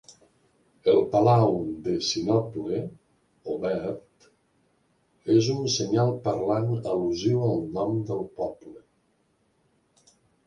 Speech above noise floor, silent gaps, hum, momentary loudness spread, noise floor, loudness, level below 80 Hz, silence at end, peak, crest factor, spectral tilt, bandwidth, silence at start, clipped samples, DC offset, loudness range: 44 dB; none; none; 13 LU; -69 dBFS; -25 LUFS; -60 dBFS; 1.7 s; -8 dBFS; 18 dB; -6.5 dB/octave; 10.5 kHz; 0.1 s; under 0.1%; under 0.1%; 5 LU